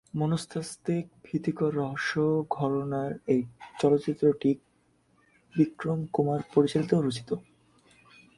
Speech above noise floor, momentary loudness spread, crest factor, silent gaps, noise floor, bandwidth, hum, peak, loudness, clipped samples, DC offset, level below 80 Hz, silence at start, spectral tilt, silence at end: 40 dB; 9 LU; 20 dB; none; -67 dBFS; 11.5 kHz; none; -8 dBFS; -28 LUFS; under 0.1%; under 0.1%; -64 dBFS; 0.15 s; -7 dB/octave; 0.95 s